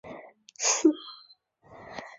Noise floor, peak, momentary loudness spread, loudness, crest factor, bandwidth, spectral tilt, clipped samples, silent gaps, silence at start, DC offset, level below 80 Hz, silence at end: -59 dBFS; -10 dBFS; 24 LU; -25 LUFS; 22 dB; 7.8 kHz; -1 dB/octave; under 0.1%; none; 0.05 s; under 0.1%; -72 dBFS; 0.1 s